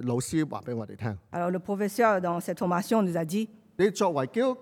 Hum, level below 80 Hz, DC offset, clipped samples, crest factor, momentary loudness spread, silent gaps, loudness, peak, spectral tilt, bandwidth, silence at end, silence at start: none; -66 dBFS; under 0.1%; under 0.1%; 18 dB; 10 LU; none; -28 LUFS; -10 dBFS; -6 dB/octave; 18.5 kHz; 0 s; 0 s